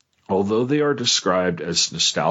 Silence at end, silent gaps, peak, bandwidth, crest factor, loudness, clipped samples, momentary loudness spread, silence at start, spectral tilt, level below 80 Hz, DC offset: 0 s; none; -6 dBFS; 8.2 kHz; 16 dB; -20 LUFS; under 0.1%; 4 LU; 0.3 s; -3 dB/octave; -60 dBFS; under 0.1%